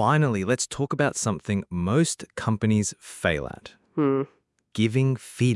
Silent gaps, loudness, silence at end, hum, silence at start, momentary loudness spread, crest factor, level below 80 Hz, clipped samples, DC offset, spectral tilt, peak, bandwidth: none; -25 LUFS; 0 s; none; 0 s; 8 LU; 18 dB; -56 dBFS; under 0.1%; under 0.1%; -5.5 dB/octave; -6 dBFS; 12 kHz